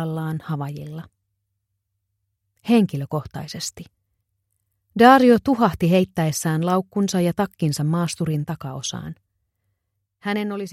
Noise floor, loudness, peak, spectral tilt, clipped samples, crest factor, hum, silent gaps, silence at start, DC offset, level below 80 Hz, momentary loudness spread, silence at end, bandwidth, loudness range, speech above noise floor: -76 dBFS; -20 LUFS; 0 dBFS; -6 dB/octave; under 0.1%; 22 dB; none; none; 0 s; under 0.1%; -54 dBFS; 18 LU; 0 s; 15.5 kHz; 9 LU; 56 dB